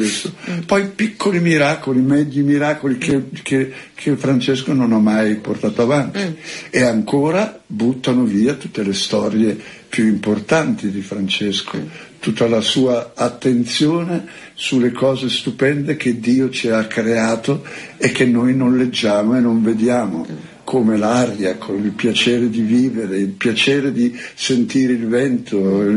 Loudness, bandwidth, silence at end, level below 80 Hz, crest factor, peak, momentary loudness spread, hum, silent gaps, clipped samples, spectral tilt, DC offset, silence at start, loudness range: -17 LUFS; 11.5 kHz; 0 s; -56 dBFS; 16 dB; -2 dBFS; 9 LU; none; none; under 0.1%; -5.5 dB/octave; under 0.1%; 0 s; 2 LU